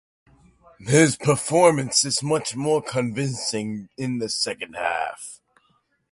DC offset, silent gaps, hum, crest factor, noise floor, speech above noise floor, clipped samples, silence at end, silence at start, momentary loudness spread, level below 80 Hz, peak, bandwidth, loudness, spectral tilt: under 0.1%; none; none; 20 dB; -66 dBFS; 44 dB; under 0.1%; 0.75 s; 0.8 s; 13 LU; -60 dBFS; -2 dBFS; 11.5 kHz; -22 LUFS; -4 dB/octave